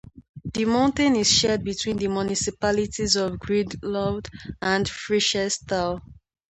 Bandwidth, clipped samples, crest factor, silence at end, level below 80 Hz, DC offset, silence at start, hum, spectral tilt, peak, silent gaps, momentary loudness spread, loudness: 9 kHz; under 0.1%; 18 dB; 0.35 s; -46 dBFS; under 0.1%; 0.05 s; none; -3.5 dB/octave; -6 dBFS; 0.29-0.34 s; 10 LU; -23 LUFS